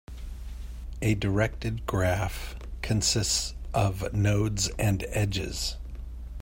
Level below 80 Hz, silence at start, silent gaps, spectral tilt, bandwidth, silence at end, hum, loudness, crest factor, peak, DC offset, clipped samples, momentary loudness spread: -38 dBFS; 0.1 s; none; -4.5 dB/octave; 16.5 kHz; 0 s; none; -28 LUFS; 16 dB; -12 dBFS; under 0.1%; under 0.1%; 16 LU